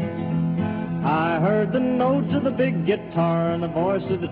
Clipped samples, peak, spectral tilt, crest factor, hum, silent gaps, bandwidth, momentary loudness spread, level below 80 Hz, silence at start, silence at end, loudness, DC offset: under 0.1%; -10 dBFS; -11.5 dB/octave; 12 dB; none; none; 4.6 kHz; 4 LU; -52 dBFS; 0 s; 0 s; -22 LUFS; under 0.1%